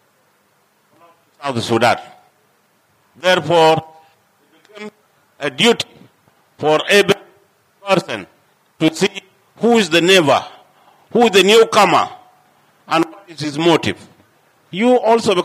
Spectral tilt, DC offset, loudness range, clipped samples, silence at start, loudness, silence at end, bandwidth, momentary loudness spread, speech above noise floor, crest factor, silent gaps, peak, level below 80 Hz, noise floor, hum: -4 dB/octave; under 0.1%; 6 LU; under 0.1%; 1.4 s; -15 LUFS; 0 s; 15.5 kHz; 17 LU; 45 dB; 14 dB; none; -4 dBFS; -66 dBFS; -59 dBFS; none